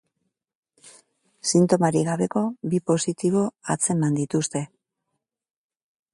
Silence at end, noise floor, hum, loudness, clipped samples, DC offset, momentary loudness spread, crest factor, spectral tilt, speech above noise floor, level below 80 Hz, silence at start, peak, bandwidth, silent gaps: 1.5 s; -80 dBFS; none; -23 LUFS; under 0.1%; under 0.1%; 8 LU; 20 dB; -5.5 dB/octave; 58 dB; -66 dBFS; 0.85 s; -6 dBFS; 11.5 kHz; none